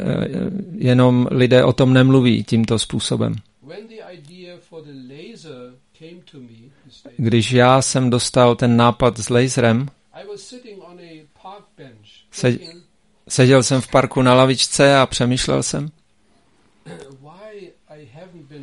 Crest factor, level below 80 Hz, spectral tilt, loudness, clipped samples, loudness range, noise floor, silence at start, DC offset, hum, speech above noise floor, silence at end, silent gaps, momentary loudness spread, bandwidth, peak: 18 dB; -46 dBFS; -5.5 dB/octave; -16 LUFS; under 0.1%; 12 LU; -60 dBFS; 0 s; under 0.1%; none; 44 dB; 0 s; none; 24 LU; 11.5 kHz; 0 dBFS